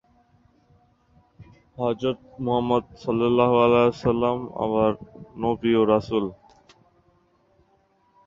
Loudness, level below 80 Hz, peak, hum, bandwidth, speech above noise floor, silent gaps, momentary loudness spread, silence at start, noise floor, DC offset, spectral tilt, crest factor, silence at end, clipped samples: -23 LUFS; -54 dBFS; -4 dBFS; none; 7.4 kHz; 42 dB; none; 11 LU; 1.4 s; -64 dBFS; under 0.1%; -8 dB/octave; 20 dB; 1.95 s; under 0.1%